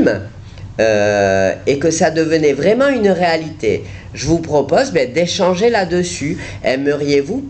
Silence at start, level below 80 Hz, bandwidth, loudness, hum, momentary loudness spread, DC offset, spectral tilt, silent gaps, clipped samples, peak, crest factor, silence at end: 0 s; -42 dBFS; 9 kHz; -15 LUFS; none; 9 LU; under 0.1%; -5 dB/octave; none; under 0.1%; -2 dBFS; 12 dB; 0 s